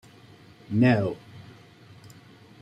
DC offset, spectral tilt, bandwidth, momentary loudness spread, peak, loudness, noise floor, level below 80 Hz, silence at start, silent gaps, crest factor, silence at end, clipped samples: under 0.1%; -8.5 dB/octave; 9.4 kHz; 26 LU; -10 dBFS; -24 LUFS; -51 dBFS; -64 dBFS; 0.7 s; none; 20 dB; 1.2 s; under 0.1%